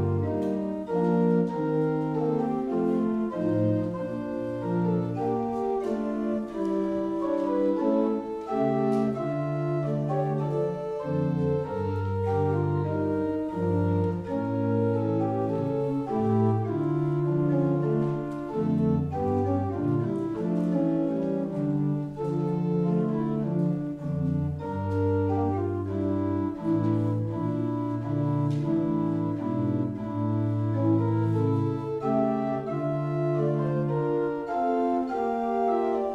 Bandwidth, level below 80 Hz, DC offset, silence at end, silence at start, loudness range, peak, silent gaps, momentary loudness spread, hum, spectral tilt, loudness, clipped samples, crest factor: 8.4 kHz; -58 dBFS; under 0.1%; 0 s; 0 s; 2 LU; -12 dBFS; none; 4 LU; none; -10.5 dB/octave; -27 LUFS; under 0.1%; 14 dB